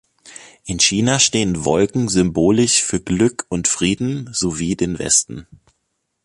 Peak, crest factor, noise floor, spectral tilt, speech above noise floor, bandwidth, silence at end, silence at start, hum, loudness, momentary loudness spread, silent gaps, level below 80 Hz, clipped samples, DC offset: -2 dBFS; 18 dB; -72 dBFS; -3.5 dB/octave; 54 dB; 11.5 kHz; 0.8 s; 0.25 s; none; -17 LUFS; 8 LU; none; -42 dBFS; under 0.1%; under 0.1%